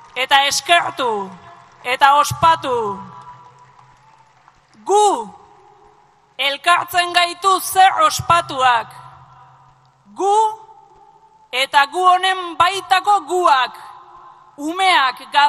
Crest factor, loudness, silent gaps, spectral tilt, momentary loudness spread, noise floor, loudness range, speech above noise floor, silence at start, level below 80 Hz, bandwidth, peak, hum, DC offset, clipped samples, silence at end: 18 dB; -16 LUFS; none; -2 dB/octave; 13 LU; -53 dBFS; 6 LU; 37 dB; 0.15 s; -58 dBFS; 14.5 kHz; 0 dBFS; none; under 0.1%; under 0.1%; 0 s